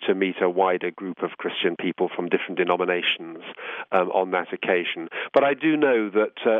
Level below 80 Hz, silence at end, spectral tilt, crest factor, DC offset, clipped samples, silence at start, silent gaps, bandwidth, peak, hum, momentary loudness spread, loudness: -78 dBFS; 0 s; -7.5 dB/octave; 18 dB; under 0.1%; under 0.1%; 0 s; none; 4.9 kHz; -6 dBFS; none; 10 LU; -23 LUFS